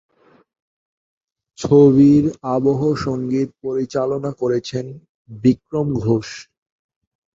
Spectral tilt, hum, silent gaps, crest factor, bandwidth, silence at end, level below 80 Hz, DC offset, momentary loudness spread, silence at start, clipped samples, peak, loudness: -8 dB/octave; none; 5.09-5.25 s; 18 dB; 7.6 kHz; 0.95 s; -50 dBFS; under 0.1%; 16 LU; 1.6 s; under 0.1%; -2 dBFS; -18 LUFS